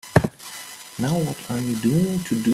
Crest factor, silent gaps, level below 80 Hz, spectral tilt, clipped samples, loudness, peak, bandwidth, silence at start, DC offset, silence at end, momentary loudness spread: 22 dB; none; -48 dBFS; -6 dB/octave; under 0.1%; -23 LUFS; -2 dBFS; 16 kHz; 0.05 s; under 0.1%; 0 s; 15 LU